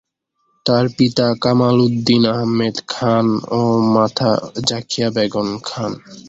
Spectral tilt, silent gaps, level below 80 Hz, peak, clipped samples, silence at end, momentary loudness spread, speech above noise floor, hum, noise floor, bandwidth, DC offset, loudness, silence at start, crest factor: -6 dB/octave; none; -52 dBFS; -2 dBFS; under 0.1%; 0 s; 8 LU; 51 dB; none; -67 dBFS; 7.8 kHz; under 0.1%; -17 LUFS; 0.65 s; 16 dB